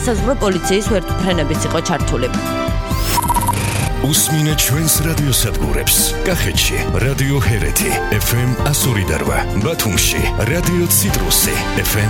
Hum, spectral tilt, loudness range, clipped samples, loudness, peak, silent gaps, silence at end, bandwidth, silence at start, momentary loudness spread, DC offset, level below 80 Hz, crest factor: none; -4 dB/octave; 3 LU; under 0.1%; -15 LUFS; 0 dBFS; none; 0 s; 18 kHz; 0 s; 5 LU; under 0.1%; -24 dBFS; 16 dB